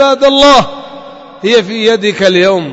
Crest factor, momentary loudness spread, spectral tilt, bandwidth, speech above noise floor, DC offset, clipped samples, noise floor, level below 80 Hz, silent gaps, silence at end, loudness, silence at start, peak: 10 dB; 15 LU; -4 dB/octave; 11 kHz; 22 dB; under 0.1%; 0.4%; -30 dBFS; -40 dBFS; none; 0 s; -8 LUFS; 0 s; 0 dBFS